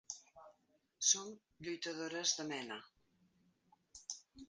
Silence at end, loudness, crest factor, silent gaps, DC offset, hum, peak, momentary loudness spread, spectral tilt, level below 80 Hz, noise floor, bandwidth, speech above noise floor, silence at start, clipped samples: 0.05 s; -38 LUFS; 26 dB; none; under 0.1%; none; -18 dBFS; 18 LU; -0.5 dB/octave; -80 dBFS; -77 dBFS; 10 kHz; 37 dB; 0.1 s; under 0.1%